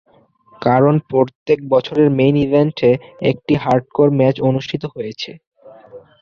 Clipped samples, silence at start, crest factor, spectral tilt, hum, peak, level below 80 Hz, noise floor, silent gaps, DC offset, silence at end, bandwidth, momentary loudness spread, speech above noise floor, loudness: under 0.1%; 0.6 s; 14 dB; -8.5 dB/octave; none; -2 dBFS; -50 dBFS; -51 dBFS; 1.35-1.46 s, 5.47-5.51 s; under 0.1%; 0.25 s; 6.8 kHz; 11 LU; 36 dB; -16 LUFS